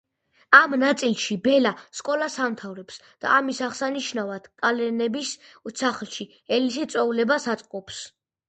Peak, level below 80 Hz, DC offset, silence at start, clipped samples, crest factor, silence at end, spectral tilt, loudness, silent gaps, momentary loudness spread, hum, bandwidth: 0 dBFS; -70 dBFS; under 0.1%; 0.5 s; under 0.1%; 24 dB; 0.4 s; -3 dB/octave; -23 LUFS; none; 16 LU; none; 9.2 kHz